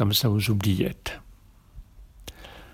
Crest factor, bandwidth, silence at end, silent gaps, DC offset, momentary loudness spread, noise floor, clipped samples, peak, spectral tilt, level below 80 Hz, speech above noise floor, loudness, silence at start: 18 dB; 17.5 kHz; 0.05 s; none; under 0.1%; 23 LU; -52 dBFS; under 0.1%; -10 dBFS; -5 dB/octave; -46 dBFS; 28 dB; -25 LUFS; 0 s